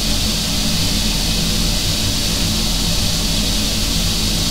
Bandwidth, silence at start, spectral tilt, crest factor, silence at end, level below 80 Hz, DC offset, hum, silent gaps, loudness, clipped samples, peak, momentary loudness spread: 16 kHz; 0 s; -3 dB/octave; 12 dB; 0 s; -24 dBFS; 3%; none; none; -17 LUFS; under 0.1%; -4 dBFS; 0 LU